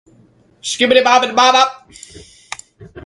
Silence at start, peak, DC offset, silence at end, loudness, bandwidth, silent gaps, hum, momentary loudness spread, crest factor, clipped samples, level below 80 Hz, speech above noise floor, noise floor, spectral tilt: 0.65 s; 0 dBFS; under 0.1%; 0.05 s; -12 LUFS; 11.5 kHz; none; none; 21 LU; 16 dB; under 0.1%; -54 dBFS; 39 dB; -51 dBFS; -1.5 dB/octave